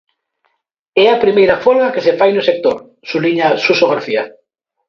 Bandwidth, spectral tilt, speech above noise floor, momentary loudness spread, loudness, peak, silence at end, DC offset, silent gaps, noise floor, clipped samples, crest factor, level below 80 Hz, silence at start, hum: 6.8 kHz; -5.5 dB/octave; 56 dB; 9 LU; -13 LUFS; 0 dBFS; 0.6 s; under 0.1%; none; -68 dBFS; under 0.1%; 14 dB; -56 dBFS; 0.95 s; none